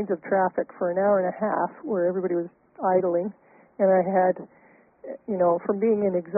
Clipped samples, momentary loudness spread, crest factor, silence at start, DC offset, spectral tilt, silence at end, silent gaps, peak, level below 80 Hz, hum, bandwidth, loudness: under 0.1%; 10 LU; 16 dB; 0 s; under 0.1%; -3 dB/octave; 0 s; none; -10 dBFS; -70 dBFS; none; 2.7 kHz; -24 LUFS